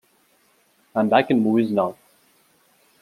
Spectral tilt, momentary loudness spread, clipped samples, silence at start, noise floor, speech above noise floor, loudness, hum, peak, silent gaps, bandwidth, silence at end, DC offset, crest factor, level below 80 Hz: -7.5 dB/octave; 9 LU; under 0.1%; 0.95 s; -61 dBFS; 43 dB; -20 LUFS; none; -2 dBFS; none; 13.5 kHz; 1.1 s; under 0.1%; 20 dB; -72 dBFS